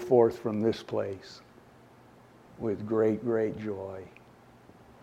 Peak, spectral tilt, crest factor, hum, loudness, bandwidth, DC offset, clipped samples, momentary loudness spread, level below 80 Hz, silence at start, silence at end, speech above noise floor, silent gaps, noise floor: -10 dBFS; -7.5 dB/octave; 22 dB; none; -30 LUFS; 12 kHz; under 0.1%; under 0.1%; 19 LU; -66 dBFS; 0 s; 0.95 s; 27 dB; none; -56 dBFS